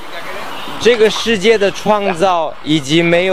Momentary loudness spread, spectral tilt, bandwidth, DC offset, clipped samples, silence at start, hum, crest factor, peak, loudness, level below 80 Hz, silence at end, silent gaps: 14 LU; -4.5 dB/octave; 15.5 kHz; 4%; under 0.1%; 0 s; none; 14 dB; 0 dBFS; -13 LUFS; -46 dBFS; 0 s; none